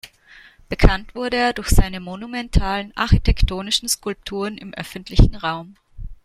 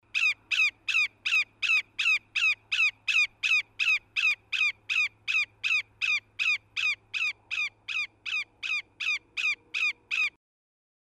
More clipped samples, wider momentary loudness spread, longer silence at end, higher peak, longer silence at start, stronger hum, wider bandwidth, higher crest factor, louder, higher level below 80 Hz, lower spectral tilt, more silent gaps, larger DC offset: neither; first, 13 LU vs 7 LU; second, 0.1 s vs 0.75 s; first, 0 dBFS vs -16 dBFS; about the same, 0.05 s vs 0.15 s; neither; about the same, 15 kHz vs 15 kHz; about the same, 18 dB vs 14 dB; first, -21 LUFS vs -26 LUFS; first, -22 dBFS vs -72 dBFS; first, -4.5 dB/octave vs 2.5 dB/octave; neither; neither